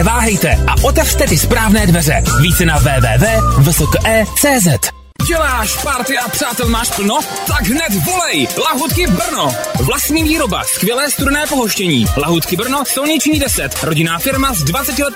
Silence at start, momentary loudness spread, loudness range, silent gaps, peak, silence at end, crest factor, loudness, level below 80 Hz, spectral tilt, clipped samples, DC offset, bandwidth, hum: 0 s; 4 LU; 3 LU; none; 0 dBFS; 0 s; 12 dB; -13 LUFS; -22 dBFS; -4 dB/octave; under 0.1%; under 0.1%; 16.5 kHz; none